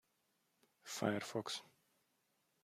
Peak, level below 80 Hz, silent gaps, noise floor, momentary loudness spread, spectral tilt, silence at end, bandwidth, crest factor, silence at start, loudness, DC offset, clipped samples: -22 dBFS; -88 dBFS; none; -82 dBFS; 9 LU; -4 dB/octave; 0.95 s; 15.5 kHz; 26 dB; 0.85 s; -43 LUFS; under 0.1%; under 0.1%